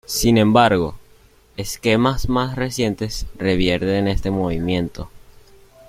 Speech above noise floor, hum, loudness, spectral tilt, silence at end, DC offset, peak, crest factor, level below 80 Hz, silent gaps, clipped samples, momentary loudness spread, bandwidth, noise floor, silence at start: 33 dB; none; -19 LUFS; -5.5 dB/octave; 0.7 s; under 0.1%; 0 dBFS; 18 dB; -34 dBFS; none; under 0.1%; 15 LU; 16.5 kHz; -51 dBFS; 0.1 s